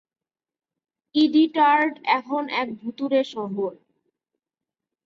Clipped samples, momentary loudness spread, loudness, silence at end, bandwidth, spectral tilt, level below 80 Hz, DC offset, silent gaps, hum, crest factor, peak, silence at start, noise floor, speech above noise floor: under 0.1%; 12 LU; -22 LUFS; 1.3 s; 7.2 kHz; -6 dB/octave; -74 dBFS; under 0.1%; none; none; 18 dB; -6 dBFS; 1.15 s; -88 dBFS; 66 dB